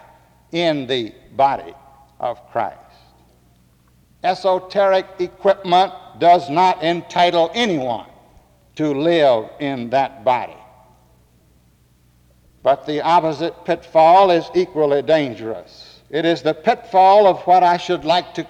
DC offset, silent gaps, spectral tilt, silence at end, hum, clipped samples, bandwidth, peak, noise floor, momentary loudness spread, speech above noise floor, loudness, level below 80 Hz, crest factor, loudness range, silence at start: under 0.1%; none; -5.5 dB/octave; 0 s; none; under 0.1%; 9.8 kHz; -4 dBFS; -55 dBFS; 13 LU; 38 dB; -17 LUFS; -56 dBFS; 14 dB; 8 LU; 0.55 s